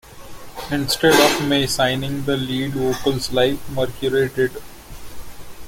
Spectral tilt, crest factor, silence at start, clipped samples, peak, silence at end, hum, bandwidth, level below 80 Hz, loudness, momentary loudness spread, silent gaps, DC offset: -4 dB/octave; 20 dB; 0.05 s; under 0.1%; -2 dBFS; 0 s; none; 17 kHz; -42 dBFS; -19 LUFS; 25 LU; none; under 0.1%